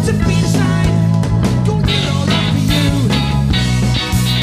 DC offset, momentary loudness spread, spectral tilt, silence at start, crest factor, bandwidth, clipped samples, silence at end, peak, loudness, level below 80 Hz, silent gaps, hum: under 0.1%; 1 LU; -5.5 dB/octave; 0 s; 12 dB; 15.5 kHz; under 0.1%; 0 s; -2 dBFS; -14 LUFS; -24 dBFS; none; none